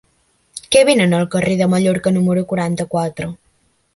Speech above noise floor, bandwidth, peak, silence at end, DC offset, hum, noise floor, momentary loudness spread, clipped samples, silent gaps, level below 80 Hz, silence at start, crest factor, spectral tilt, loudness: 45 dB; 11.5 kHz; 0 dBFS; 0.6 s; under 0.1%; none; -60 dBFS; 16 LU; under 0.1%; none; -50 dBFS; 0.55 s; 16 dB; -5.5 dB/octave; -16 LUFS